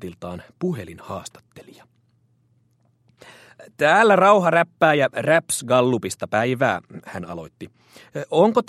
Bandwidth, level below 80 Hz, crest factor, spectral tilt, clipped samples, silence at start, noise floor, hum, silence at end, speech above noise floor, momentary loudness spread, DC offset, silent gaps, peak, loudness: 14.5 kHz; -62 dBFS; 20 dB; -5 dB/octave; under 0.1%; 0 s; -63 dBFS; none; 0.05 s; 42 dB; 21 LU; under 0.1%; none; -2 dBFS; -19 LUFS